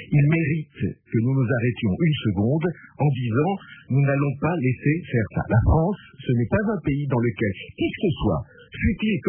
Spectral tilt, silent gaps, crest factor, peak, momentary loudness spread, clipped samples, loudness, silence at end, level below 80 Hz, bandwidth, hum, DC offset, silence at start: -12 dB/octave; none; 16 dB; -6 dBFS; 7 LU; under 0.1%; -23 LUFS; 0 s; -38 dBFS; 3.4 kHz; none; under 0.1%; 0 s